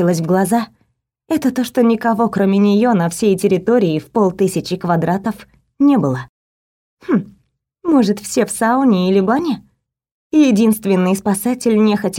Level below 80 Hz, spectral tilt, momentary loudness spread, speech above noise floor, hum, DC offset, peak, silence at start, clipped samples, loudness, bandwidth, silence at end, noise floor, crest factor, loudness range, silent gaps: -54 dBFS; -6 dB/octave; 8 LU; 49 dB; none; under 0.1%; -2 dBFS; 0 s; under 0.1%; -15 LUFS; 17 kHz; 0 s; -64 dBFS; 14 dB; 4 LU; 6.29-6.97 s, 10.11-10.30 s